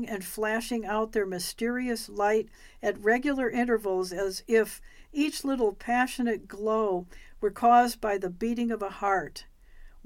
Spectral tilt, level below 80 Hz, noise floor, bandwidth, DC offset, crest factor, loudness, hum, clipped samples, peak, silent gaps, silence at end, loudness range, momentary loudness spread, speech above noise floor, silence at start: -4 dB/octave; -52 dBFS; -49 dBFS; 17 kHz; under 0.1%; 18 dB; -28 LUFS; none; under 0.1%; -10 dBFS; none; 0.05 s; 2 LU; 7 LU; 21 dB; 0 s